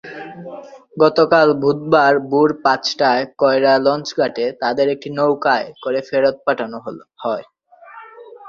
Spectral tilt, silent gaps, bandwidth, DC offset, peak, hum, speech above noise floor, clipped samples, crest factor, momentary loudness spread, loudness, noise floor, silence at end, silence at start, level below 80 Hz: -5.5 dB/octave; none; 7.4 kHz; under 0.1%; -2 dBFS; none; 25 dB; under 0.1%; 16 dB; 19 LU; -17 LUFS; -41 dBFS; 0 s; 0.05 s; -60 dBFS